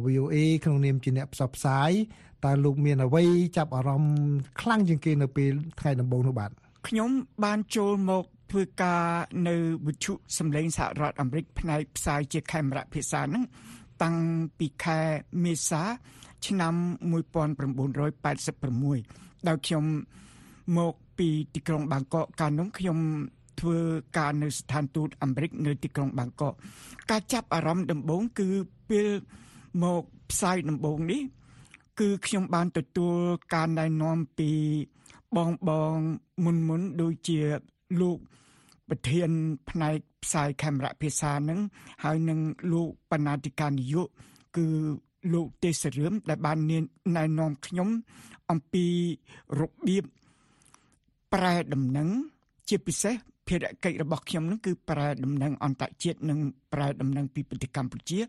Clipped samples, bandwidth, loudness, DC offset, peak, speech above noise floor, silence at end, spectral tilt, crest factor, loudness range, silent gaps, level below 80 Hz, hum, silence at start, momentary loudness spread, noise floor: under 0.1%; 12.5 kHz; -29 LUFS; under 0.1%; -10 dBFS; 40 dB; 0 s; -6 dB/octave; 18 dB; 5 LU; none; -54 dBFS; none; 0 s; 7 LU; -68 dBFS